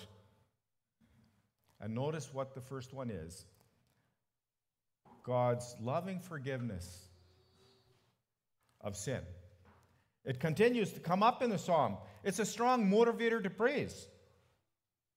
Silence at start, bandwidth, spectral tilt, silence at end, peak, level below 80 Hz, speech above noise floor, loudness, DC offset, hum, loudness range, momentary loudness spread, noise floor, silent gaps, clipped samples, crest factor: 0 s; 16 kHz; -5.5 dB/octave; 1.1 s; -16 dBFS; -70 dBFS; over 55 dB; -35 LUFS; under 0.1%; none; 14 LU; 18 LU; under -90 dBFS; none; under 0.1%; 22 dB